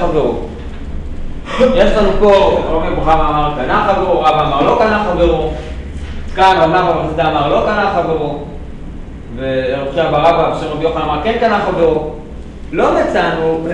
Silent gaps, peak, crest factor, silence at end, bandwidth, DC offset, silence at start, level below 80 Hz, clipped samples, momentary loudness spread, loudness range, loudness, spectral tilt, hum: none; 0 dBFS; 12 dB; 0 s; 10 kHz; under 0.1%; 0 s; -24 dBFS; under 0.1%; 17 LU; 4 LU; -13 LUFS; -6.5 dB/octave; none